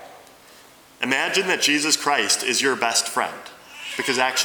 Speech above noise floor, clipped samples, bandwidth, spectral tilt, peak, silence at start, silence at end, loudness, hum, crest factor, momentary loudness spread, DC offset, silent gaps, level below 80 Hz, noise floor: 27 dB; under 0.1%; over 20 kHz; -0.5 dB/octave; -4 dBFS; 0 s; 0 s; -20 LUFS; none; 20 dB; 12 LU; under 0.1%; none; -72 dBFS; -49 dBFS